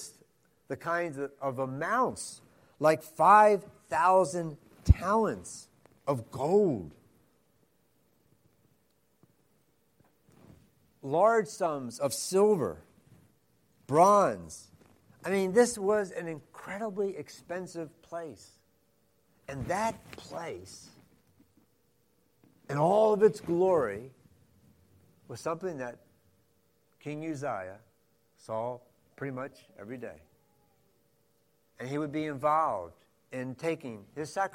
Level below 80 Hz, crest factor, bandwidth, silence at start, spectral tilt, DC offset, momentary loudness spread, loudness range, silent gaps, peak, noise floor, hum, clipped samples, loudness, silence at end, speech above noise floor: -48 dBFS; 24 dB; 16.5 kHz; 0 s; -5.5 dB/octave; under 0.1%; 20 LU; 14 LU; none; -6 dBFS; -72 dBFS; none; under 0.1%; -29 LUFS; 0.05 s; 43 dB